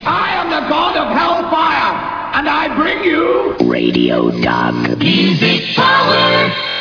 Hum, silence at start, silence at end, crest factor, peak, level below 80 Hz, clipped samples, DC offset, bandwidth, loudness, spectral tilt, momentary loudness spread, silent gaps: none; 0 s; 0 s; 14 dB; 0 dBFS; -44 dBFS; under 0.1%; under 0.1%; 5.4 kHz; -13 LUFS; -6 dB/octave; 5 LU; none